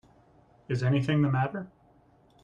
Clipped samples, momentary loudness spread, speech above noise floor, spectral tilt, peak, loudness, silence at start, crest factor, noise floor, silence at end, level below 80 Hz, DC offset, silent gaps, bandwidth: under 0.1%; 14 LU; 35 dB; -8 dB/octave; -14 dBFS; -28 LUFS; 0.7 s; 16 dB; -61 dBFS; 0.8 s; -62 dBFS; under 0.1%; none; 7.8 kHz